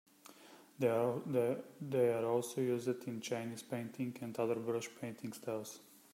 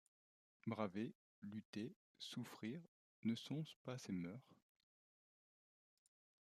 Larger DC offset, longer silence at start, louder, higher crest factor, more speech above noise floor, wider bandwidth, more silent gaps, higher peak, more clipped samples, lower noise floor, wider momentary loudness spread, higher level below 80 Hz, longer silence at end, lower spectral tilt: neither; second, 0.25 s vs 0.65 s; first, -38 LUFS vs -50 LUFS; about the same, 18 dB vs 22 dB; second, 22 dB vs over 41 dB; first, 16 kHz vs 14.5 kHz; second, none vs 1.15-1.42 s, 1.65-1.73 s, 1.96-2.15 s, 2.88-3.23 s, 3.76-3.85 s; first, -20 dBFS vs -28 dBFS; neither; second, -60 dBFS vs under -90 dBFS; first, 12 LU vs 9 LU; first, -84 dBFS vs under -90 dBFS; second, 0.3 s vs 1.95 s; about the same, -6 dB/octave vs -6 dB/octave